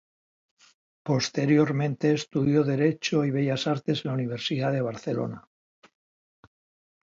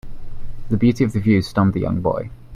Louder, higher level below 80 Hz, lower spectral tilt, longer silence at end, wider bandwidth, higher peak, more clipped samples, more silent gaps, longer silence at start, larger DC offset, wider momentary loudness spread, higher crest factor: second, -26 LUFS vs -19 LUFS; second, -68 dBFS vs -34 dBFS; second, -6 dB/octave vs -8 dB/octave; first, 1.65 s vs 0 s; second, 7.6 kHz vs 13 kHz; second, -10 dBFS vs -4 dBFS; neither; neither; first, 1.05 s vs 0.05 s; neither; second, 8 LU vs 12 LU; about the same, 18 dB vs 16 dB